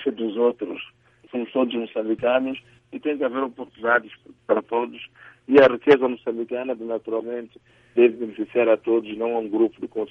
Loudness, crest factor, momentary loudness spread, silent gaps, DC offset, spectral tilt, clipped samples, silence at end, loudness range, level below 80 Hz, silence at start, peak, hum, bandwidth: -23 LUFS; 20 dB; 15 LU; none; under 0.1%; -7 dB/octave; under 0.1%; 0.05 s; 5 LU; -66 dBFS; 0 s; -2 dBFS; none; 6 kHz